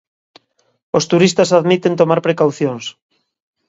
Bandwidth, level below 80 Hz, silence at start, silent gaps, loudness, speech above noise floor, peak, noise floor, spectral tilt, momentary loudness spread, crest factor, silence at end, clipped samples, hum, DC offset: 8 kHz; -60 dBFS; 0.95 s; none; -14 LUFS; 37 dB; 0 dBFS; -51 dBFS; -5.5 dB/octave; 9 LU; 16 dB; 0.75 s; under 0.1%; none; under 0.1%